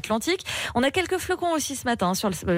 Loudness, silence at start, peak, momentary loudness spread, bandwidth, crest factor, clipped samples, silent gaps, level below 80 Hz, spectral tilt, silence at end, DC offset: -25 LUFS; 0.05 s; -12 dBFS; 3 LU; 16 kHz; 14 dB; under 0.1%; none; -50 dBFS; -4 dB/octave; 0 s; under 0.1%